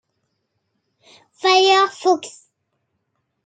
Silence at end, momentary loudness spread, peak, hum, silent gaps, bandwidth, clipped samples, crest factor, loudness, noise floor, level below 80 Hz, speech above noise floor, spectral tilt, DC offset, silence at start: 1.15 s; 9 LU; -2 dBFS; none; none; 9.2 kHz; under 0.1%; 18 dB; -16 LUFS; -73 dBFS; -80 dBFS; 56 dB; -1 dB/octave; under 0.1%; 1.45 s